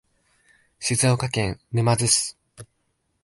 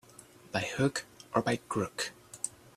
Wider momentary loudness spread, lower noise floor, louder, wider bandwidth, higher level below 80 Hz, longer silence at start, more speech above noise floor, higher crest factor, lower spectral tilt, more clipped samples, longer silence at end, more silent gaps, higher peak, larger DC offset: about the same, 9 LU vs 9 LU; first, -72 dBFS vs -55 dBFS; first, -22 LUFS vs -34 LUFS; second, 12 kHz vs 15.5 kHz; first, -50 dBFS vs -66 dBFS; first, 0.8 s vs 0.2 s; first, 50 dB vs 24 dB; about the same, 22 dB vs 24 dB; about the same, -3.5 dB/octave vs -4.5 dB/octave; neither; first, 0.6 s vs 0.25 s; neither; first, -4 dBFS vs -12 dBFS; neither